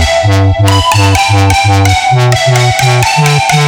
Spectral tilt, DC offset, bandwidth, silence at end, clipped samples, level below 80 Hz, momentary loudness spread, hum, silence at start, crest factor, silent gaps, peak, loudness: -4.5 dB/octave; under 0.1%; over 20 kHz; 0 s; 0.3%; -26 dBFS; 1 LU; none; 0 s; 8 dB; none; 0 dBFS; -8 LUFS